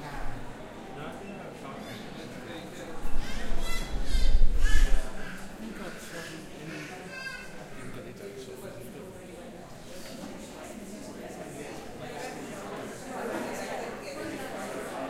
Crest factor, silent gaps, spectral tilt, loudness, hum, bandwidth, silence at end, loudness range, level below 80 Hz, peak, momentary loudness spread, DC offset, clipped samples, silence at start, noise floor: 20 dB; none; -4.5 dB/octave; -38 LUFS; none; 13 kHz; 0 s; 9 LU; -32 dBFS; -8 dBFS; 12 LU; under 0.1%; under 0.1%; 0 s; -44 dBFS